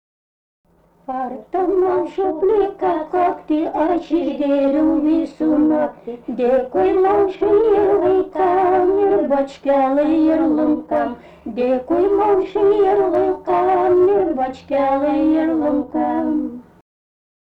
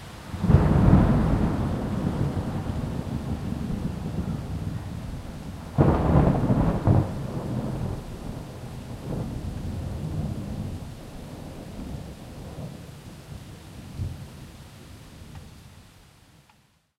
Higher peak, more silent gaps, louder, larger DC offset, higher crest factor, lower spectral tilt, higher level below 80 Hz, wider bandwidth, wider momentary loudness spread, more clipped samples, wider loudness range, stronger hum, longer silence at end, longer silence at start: second, -8 dBFS vs -4 dBFS; neither; first, -17 LUFS vs -26 LUFS; neither; second, 10 dB vs 24 dB; about the same, -8 dB/octave vs -8.5 dB/octave; second, -48 dBFS vs -34 dBFS; second, 5.8 kHz vs 15 kHz; second, 7 LU vs 22 LU; neither; second, 3 LU vs 16 LU; neither; second, 0.8 s vs 1.15 s; first, 1.1 s vs 0 s